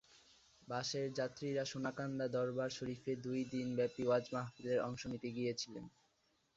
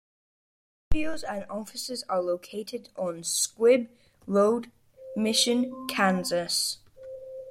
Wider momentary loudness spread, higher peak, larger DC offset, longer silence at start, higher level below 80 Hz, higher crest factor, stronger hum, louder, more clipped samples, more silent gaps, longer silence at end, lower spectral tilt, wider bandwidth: second, 7 LU vs 18 LU; second, -24 dBFS vs -10 dBFS; neither; second, 0.15 s vs 0.9 s; second, -74 dBFS vs -46 dBFS; about the same, 18 dB vs 18 dB; neither; second, -41 LUFS vs -27 LUFS; neither; neither; first, 0.65 s vs 0 s; first, -5 dB/octave vs -3 dB/octave; second, 7.8 kHz vs 16.5 kHz